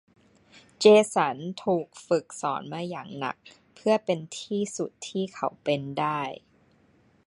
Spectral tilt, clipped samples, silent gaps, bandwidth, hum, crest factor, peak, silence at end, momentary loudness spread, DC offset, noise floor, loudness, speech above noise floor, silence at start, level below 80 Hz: -5 dB/octave; under 0.1%; none; 11.5 kHz; none; 22 dB; -6 dBFS; 0.9 s; 15 LU; under 0.1%; -62 dBFS; -27 LUFS; 36 dB; 0.8 s; -72 dBFS